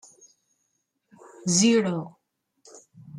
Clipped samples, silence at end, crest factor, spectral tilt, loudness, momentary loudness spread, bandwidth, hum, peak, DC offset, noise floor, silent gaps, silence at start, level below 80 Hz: under 0.1%; 0 s; 20 dB; -4 dB/octave; -23 LUFS; 15 LU; 12 kHz; none; -8 dBFS; under 0.1%; -76 dBFS; none; 1.45 s; -70 dBFS